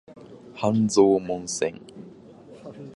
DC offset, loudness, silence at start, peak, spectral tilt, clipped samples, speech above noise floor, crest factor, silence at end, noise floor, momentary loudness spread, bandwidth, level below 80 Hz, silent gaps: under 0.1%; -23 LUFS; 0.1 s; -4 dBFS; -5.5 dB/octave; under 0.1%; 25 dB; 20 dB; 0.05 s; -47 dBFS; 25 LU; 11.5 kHz; -62 dBFS; none